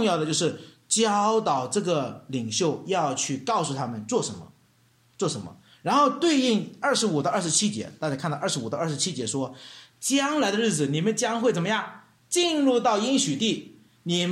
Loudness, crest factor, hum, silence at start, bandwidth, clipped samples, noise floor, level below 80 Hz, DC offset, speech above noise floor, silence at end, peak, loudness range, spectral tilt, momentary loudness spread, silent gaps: -25 LUFS; 16 dB; none; 0 s; 15 kHz; under 0.1%; -62 dBFS; -70 dBFS; under 0.1%; 37 dB; 0 s; -8 dBFS; 4 LU; -3.5 dB/octave; 10 LU; none